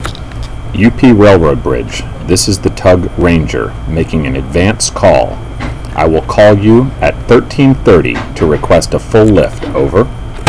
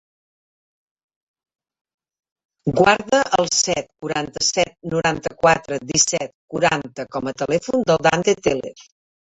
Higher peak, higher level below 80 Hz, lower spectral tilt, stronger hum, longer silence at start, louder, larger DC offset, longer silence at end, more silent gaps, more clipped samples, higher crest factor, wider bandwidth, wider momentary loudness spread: about the same, 0 dBFS vs -2 dBFS; first, -22 dBFS vs -52 dBFS; first, -6 dB/octave vs -3 dB/octave; neither; second, 0 s vs 2.65 s; first, -9 LUFS vs -19 LUFS; first, 3% vs under 0.1%; second, 0 s vs 0.5 s; second, none vs 6.34-6.48 s; first, 2% vs under 0.1%; second, 10 dB vs 20 dB; first, 11 kHz vs 8.4 kHz; first, 13 LU vs 10 LU